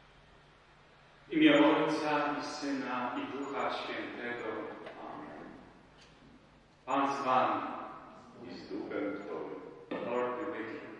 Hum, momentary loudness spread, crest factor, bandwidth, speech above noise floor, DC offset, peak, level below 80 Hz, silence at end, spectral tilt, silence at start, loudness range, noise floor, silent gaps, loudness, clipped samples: none; 20 LU; 22 dB; 9.6 kHz; 29 dB; under 0.1%; -12 dBFS; -72 dBFS; 0 s; -5 dB/octave; 1.25 s; 10 LU; -61 dBFS; none; -33 LUFS; under 0.1%